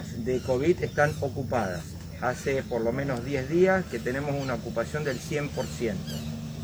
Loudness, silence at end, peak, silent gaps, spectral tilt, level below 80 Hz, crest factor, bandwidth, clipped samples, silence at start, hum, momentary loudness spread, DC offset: -28 LUFS; 0 s; -10 dBFS; none; -6 dB/octave; -48 dBFS; 18 dB; over 20 kHz; under 0.1%; 0 s; none; 9 LU; under 0.1%